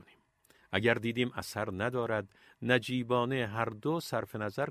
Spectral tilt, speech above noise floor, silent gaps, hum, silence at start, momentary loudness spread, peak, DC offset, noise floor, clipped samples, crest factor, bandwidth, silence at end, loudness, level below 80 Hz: -5.5 dB/octave; 34 dB; none; none; 0.7 s; 7 LU; -10 dBFS; under 0.1%; -67 dBFS; under 0.1%; 22 dB; 15.5 kHz; 0 s; -33 LUFS; -62 dBFS